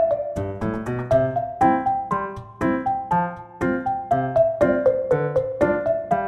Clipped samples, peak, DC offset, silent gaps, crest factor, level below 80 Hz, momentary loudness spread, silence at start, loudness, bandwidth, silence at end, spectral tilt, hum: under 0.1%; -6 dBFS; under 0.1%; none; 16 dB; -46 dBFS; 8 LU; 0 s; -22 LUFS; 11.5 kHz; 0 s; -8.5 dB/octave; none